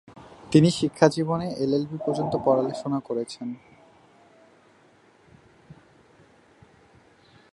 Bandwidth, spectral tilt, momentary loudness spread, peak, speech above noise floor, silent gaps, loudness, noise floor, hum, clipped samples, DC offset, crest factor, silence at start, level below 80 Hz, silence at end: 11.5 kHz; -6.5 dB/octave; 16 LU; -2 dBFS; 34 dB; none; -24 LUFS; -58 dBFS; none; under 0.1%; under 0.1%; 26 dB; 0.15 s; -62 dBFS; 1.8 s